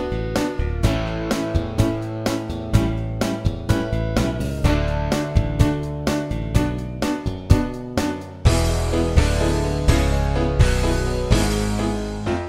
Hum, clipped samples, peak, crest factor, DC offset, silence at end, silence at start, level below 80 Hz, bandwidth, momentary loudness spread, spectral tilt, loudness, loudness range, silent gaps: none; under 0.1%; 0 dBFS; 20 dB; 0.5%; 0 s; 0 s; -24 dBFS; 16 kHz; 6 LU; -6 dB/octave; -22 LUFS; 3 LU; none